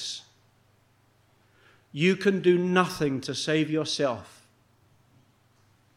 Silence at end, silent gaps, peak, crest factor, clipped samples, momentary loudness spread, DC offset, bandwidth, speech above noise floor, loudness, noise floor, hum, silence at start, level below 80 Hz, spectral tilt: 1.7 s; none; -8 dBFS; 22 dB; under 0.1%; 14 LU; under 0.1%; 15 kHz; 39 dB; -26 LUFS; -64 dBFS; none; 0 s; -66 dBFS; -5 dB/octave